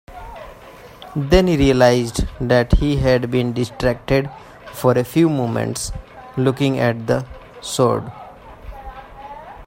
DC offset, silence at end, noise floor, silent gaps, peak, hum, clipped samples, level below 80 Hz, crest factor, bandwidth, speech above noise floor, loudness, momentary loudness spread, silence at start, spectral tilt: under 0.1%; 0 s; -40 dBFS; none; 0 dBFS; none; under 0.1%; -30 dBFS; 18 dB; 16.5 kHz; 23 dB; -18 LUFS; 22 LU; 0.1 s; -6 dB/octave